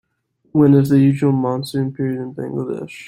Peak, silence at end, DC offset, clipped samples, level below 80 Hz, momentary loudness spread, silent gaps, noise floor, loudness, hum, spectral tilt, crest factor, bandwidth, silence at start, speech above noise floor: -2 dBFS; 0 s; under 0.1%; under 0.1%; -56 dBFS; 13 LU; none; -64 dBFS; -17 LUFS; none; -8.5 dB/octave; 14 dB; 15.5 kHz; 0.55 s; 47 dB